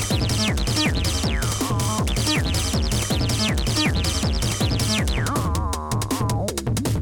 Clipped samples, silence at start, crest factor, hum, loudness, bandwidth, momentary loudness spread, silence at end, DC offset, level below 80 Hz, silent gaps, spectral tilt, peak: under 0.1%; 0 s; 14 dB; none; -22 LUFS; 19 kHz; 4 LU; 0 s; under 0.1%; -28 dBFS; none; -4 dB/octave; -8 dBFS